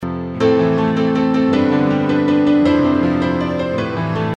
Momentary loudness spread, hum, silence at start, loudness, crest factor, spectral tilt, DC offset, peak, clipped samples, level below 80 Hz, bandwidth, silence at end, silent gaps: 6 LU; none; 0 s; -16 LUFS; 12 dB; -8 dB/octave; under 0.1%; -2 dBFS; under 0.1%; -44 dBFS; 7.6 kHz; 0 s; none